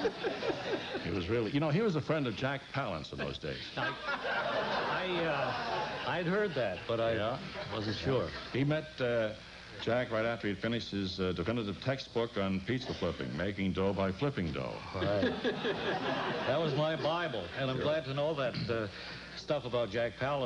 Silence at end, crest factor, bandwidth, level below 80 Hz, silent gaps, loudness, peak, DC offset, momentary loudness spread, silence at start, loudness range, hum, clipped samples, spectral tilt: 0 s; 14 dB; 10.5 kHz; -58 dBFS; none; -34 LUFS; -20 dBFS; under 0.1%; 5 LU; 0 s; 2 LU; none; under 0.1%; -6.5 dB/octave